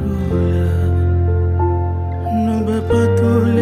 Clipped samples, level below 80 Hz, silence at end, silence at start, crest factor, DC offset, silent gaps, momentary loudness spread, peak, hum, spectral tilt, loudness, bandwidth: under 0.1%; -32 dBFS; 0 s; 0 s; 12 dB; under 0.1%; none; 5 LU; -4 dBFS; none; -9 dB/octave; -17 LUFS; 10 kHz